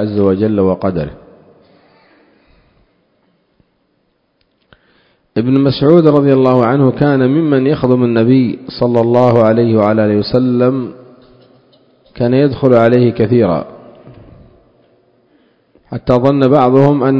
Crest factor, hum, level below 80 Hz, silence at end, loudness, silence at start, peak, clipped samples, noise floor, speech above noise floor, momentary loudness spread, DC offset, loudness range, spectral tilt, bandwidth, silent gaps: 12 dB; none; -44 dBFS; 0 s; -11 LUFS; 0 s; 0 dBFS; 0.3%; -61 dBFS; 51 dB; 9 LU; under 0.1%; 8 LU; -10 dB/octave; 5.8 kHz; none